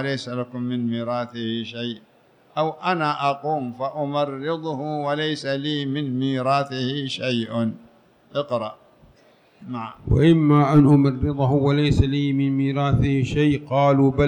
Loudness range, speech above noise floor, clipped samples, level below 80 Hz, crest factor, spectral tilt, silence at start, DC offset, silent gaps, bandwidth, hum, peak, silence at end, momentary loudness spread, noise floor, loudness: 8 LU; 34 dB; under 0.1%; -40 dBFS; 16 dB; -7.5 dB/octave; 0 s; under 0.1%; none; 9.4 kHz; none; -6 dBFS; 0 s; 13 LU; -55 dBFS; -22 LUFS